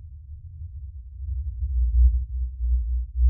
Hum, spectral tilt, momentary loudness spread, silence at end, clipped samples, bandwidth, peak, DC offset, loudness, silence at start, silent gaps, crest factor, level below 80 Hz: none; -27 dB/octave; 20 LU; 0 s; under 0.1%; 0.2 kHz; -10 dBFS; under 0.1%; -26 LUFS; 0 s; none; 14 dB; -24 dBFS